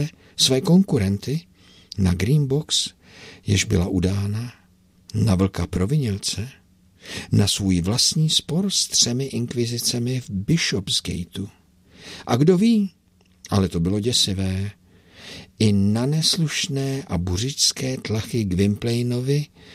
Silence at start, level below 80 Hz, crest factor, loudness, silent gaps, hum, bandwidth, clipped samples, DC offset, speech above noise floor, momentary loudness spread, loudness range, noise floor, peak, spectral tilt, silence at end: 0 s; -46 dBFS; 18 dB; -21 LUFS; none; none; 15.5 kHz; under 0.1%; under 0.1%; 35 dB; 13 LU; 3 LU; -56 dBFS; -4 dBFS; -4.5 dB/octave; 0 s